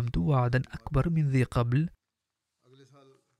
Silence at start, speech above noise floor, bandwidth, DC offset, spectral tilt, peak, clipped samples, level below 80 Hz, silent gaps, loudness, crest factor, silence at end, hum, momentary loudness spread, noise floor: 0 s; 60 dB; 10.5 kHz; under 0.1%; -8.5 dB/octave; -12 dBFS; under 0.1%; -44 dBFS; none; -28 LUFS; 16 dB; 1.5 s; none; 5 LU; -86 dBFS